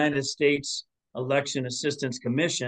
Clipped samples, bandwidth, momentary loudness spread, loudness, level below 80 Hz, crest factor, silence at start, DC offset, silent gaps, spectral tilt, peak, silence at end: under 0.1%; 10 kHz; 10 LU; -27 LUFS; -66 dBFS; 18 dB; 0 s; under 0.1%; none; -4 dB/octave; -10 dBFS; 0 s